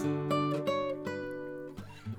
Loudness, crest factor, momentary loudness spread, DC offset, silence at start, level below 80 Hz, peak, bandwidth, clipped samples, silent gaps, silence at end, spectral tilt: -34 LUFS; 14 dB; 13 LU; under 0.1%; 0 s; -64 dBFS; -20 dBFS; 16 kHz; under 0.1%; none; 0 s; -7 dB/octave